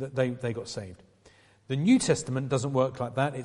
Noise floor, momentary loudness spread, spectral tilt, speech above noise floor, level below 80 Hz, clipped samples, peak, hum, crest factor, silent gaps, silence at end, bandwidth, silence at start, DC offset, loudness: -59 dBFS; 14 LU; -5.5 dB/octave; 31 dB; -60 dBFS; under 0.1%; -10 dBFS; none; 18 dB; none; 0 s; 11.5 kHz; 0 s; under 0.1%; -28 LUFS